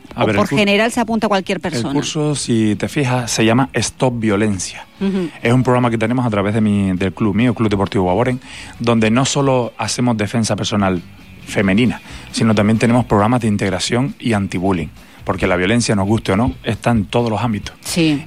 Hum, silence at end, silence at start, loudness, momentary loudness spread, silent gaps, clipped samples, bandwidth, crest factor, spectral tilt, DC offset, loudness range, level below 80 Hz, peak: none; 0 s; 0.1 s; -16 LUFS; 7 LU; none; under 0.1%; 15.5 kHz; 12 dB; -5.5 dB/octave; 0.5%; 1 LU; -42 dBFS; -4 dBFS